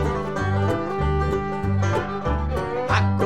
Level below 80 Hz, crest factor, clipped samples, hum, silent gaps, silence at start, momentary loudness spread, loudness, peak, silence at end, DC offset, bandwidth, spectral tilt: -32 dBFS; 18 dB; under 0.1%; none; none; 0 s; 4 LU; -24 LUFS; -6 dBFS; 0 s; 0.9%; 9.6 kHz; -7 dB/octave